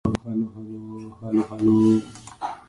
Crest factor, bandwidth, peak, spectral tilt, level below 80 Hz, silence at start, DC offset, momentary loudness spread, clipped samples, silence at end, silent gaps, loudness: 16 dB; 11 kHz; -6 dBFS; -8 dB/octave; -48 dBFS; 0.05 s; under 0.1%; 19 LU; under 0.1%; 0.1 s; none; -22 LUFS